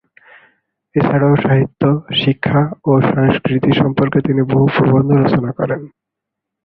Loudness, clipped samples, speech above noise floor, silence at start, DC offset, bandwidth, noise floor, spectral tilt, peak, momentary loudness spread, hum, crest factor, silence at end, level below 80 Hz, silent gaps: -14 LUFS; under 0.1%; 67 dB; 0.95 s; under 0.1%; 4.9 kHz; -80 dBFS; -10.5 dB/octave; 0 dBFS; 5 LU; none; 14 dB; 0.8 s; -46 dBFS; none